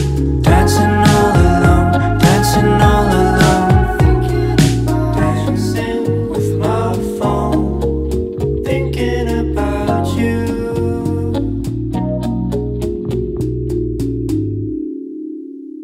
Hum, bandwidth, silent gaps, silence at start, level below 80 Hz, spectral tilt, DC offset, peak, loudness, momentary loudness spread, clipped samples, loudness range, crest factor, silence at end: none; 16 kHz; none; 0 s; -22 dBFS; -6.5 dB/octave; under 0.1%; 0 dBFS; -15 LUFS; 9 LU; under 0.1%; 8 LU; 14 dB; 0 s